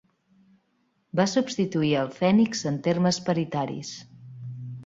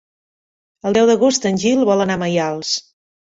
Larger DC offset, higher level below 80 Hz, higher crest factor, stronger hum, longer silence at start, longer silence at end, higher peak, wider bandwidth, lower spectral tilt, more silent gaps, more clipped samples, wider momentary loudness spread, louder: neither; second, -66 dBFS vs -56 dBFS; about the same, 18 dB vs 16 dB; neither; first, 1.15 s vs 0.85 s; second, 0 s vs 0.55 s; second, -10 dBFS vs -2 dBFS; about the same, 7.8 kHz vs 8 kHz; about the same, -5.5 dB/octave vs -4.5 dB/octave; neither; neither; first, 17 LU vs 8 LU; second, -25 LUFS vs -17 LUFS